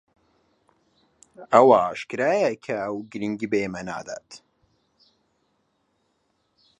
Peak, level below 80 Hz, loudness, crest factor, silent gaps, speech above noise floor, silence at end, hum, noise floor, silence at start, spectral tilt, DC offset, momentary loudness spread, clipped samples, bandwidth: -2 dBFS; -66 dBFS; -22 LUFS; 24 dB; none; 49 dB; 2.4 s; none; -71 dBFS; 1.4 s; -5.5 dB/octave; under 0.1%; 17 LU; under 0.1%; 9.8 kHz